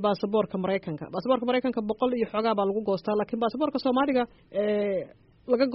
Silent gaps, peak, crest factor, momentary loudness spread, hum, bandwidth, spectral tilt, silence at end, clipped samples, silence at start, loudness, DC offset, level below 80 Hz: none; -10 dBFS; 16 dB; 7 LU; none; 5.8 kHz; -5 dB/octave; 0 s; under 0.1%; 0 s; -27 LUFS; under 0.1%; -62 dBFS